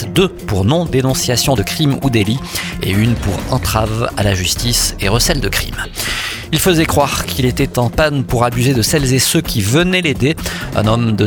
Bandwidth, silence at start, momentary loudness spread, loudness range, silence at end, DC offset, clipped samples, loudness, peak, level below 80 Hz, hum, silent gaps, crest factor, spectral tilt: 19.5 kHz; 0 s; 6 LU; 2 LU; 0 s; under 0.1%; under 0.1%; -15 LUFS; 0 dBFS; -28 dBFS; none; none; 14 dB; -4.5 dB/octave